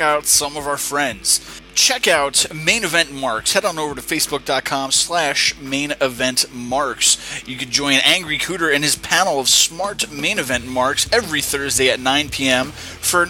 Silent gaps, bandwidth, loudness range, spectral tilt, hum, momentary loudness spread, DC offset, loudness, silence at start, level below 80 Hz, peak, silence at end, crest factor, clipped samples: none; 18 kHz; 2 LU; -1 dB/octave; none; 8 LU; under 0.1%; -17 LUFS; 0 s; -46 dBFS; 0 dBFS; 0 s; 18 dB; under 0.1%